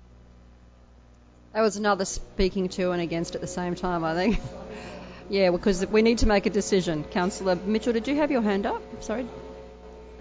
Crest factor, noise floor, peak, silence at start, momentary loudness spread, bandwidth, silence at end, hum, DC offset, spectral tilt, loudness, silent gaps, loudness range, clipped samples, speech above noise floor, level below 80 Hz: 18 dB; -53 dBFS; -8 dBFS; 1.55 s; 17 LU; 8 kHz; 0 s; 60 Hz at -50 dBFS; under 0.1%; -5 dB/octave; -26 LUFS; none; 4 LU; under 0.1%; 28 dB; -40 dBFS